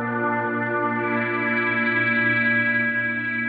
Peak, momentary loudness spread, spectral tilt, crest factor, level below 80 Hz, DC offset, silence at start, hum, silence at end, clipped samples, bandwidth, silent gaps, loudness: -10 dBFS; 5 LU; -9 dB/octave; 12 dB; -66 dBFS; under 0.1%; 0 s; none; 0 s; under 0.1%; 4.9 kHz; none; -21 LUFS